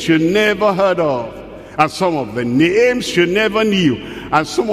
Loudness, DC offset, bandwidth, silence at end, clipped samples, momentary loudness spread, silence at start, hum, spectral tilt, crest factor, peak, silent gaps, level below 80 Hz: -15 LUFS; under 0.1%; 15 kHz; 0 s; under 0.1%; 9 LU; 0 s; none; -5 dB/octave; 16 dB; 0 dBFS; none; -46 dBFS